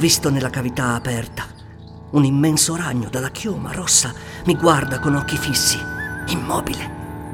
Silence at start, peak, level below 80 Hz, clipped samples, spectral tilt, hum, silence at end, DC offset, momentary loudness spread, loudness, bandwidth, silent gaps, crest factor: 0 s; -2 dBFS; -40 dBFS; under 0.1%; -3.5 dB/octave; none; 0 s; under 0.1%; 13 LU; -19 LUFS; 18.5 kHz; none; 18 dB